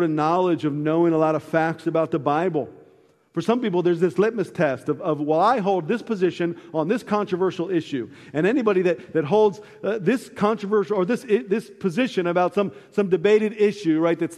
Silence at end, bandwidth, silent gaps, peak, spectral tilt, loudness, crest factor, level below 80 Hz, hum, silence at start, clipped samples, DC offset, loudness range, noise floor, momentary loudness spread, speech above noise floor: 0 s; 12.5 kHz; none; -6 dBFS; -7 dB/octave; -22 LUFS; 16 dB; -68 dBFS; none; 0 s; under 0.1%; under 0.1%; 2 LU; -56 dBFS; 7 LU; 34 dB